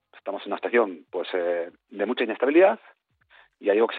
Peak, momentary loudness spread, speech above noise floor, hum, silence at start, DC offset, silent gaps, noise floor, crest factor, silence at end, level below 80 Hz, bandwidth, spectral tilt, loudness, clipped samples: -8 dBFS; 15 LU; 34 dB; none; 0.15 s; under 0.1%; none; -58 dBFS; 18 dB; 0 s; -80 dBFS; 4.6 kHz; -2 dB/octave; -25 LUFS; under 0.1%